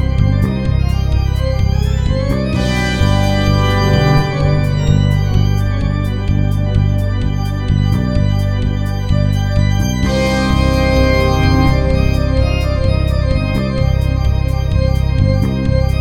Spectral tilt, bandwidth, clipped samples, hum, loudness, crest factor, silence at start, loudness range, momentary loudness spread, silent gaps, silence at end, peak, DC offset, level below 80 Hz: -7 dB/octave; 13.5 kHz; under 0.1%; none; -15 LUFS; 12 dB; 0 s; 2 LU; 4 LU; none; 0 s; 0 dBFS; under 0.1%; -18 dBFS